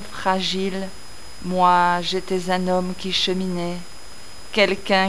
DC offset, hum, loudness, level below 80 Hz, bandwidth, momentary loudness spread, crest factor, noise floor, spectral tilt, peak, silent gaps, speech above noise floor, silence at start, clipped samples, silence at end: 3%; none; -21 LUFS; -50 dBFS; 11 kHz; 22 LU; 18 dB; -42 dBFS; -4.5 dB/octave; -4 dBFS; none; 21 dB; 0 s; under 0.1%; 0 s